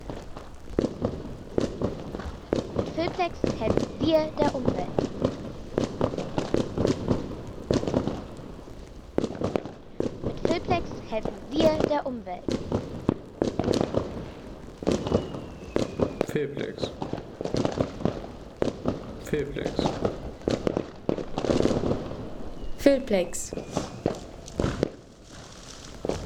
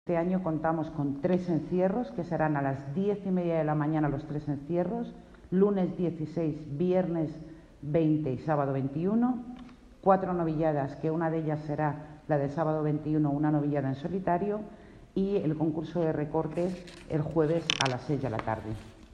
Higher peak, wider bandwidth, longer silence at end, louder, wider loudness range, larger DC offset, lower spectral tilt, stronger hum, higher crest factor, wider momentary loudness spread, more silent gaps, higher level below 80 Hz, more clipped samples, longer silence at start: about the same, -6 dBFS vs -6 dBFS; first, 19 kHz vs 9.8 kHz; about the same, 0 s vs 0 s; about the same, -29 LUFS vs -30 LUFS; about the same, 3 LU vs 1 LU; neither; about the same, -6 dB/octave vs -7 dB/octave; neither; about the same, 22 dB vs 24 dB; first, 14 LU vs 8 LU; neither; first, -44 dBFS vs -56 dBFS; neither; about the same, 0 s vs 0.05 s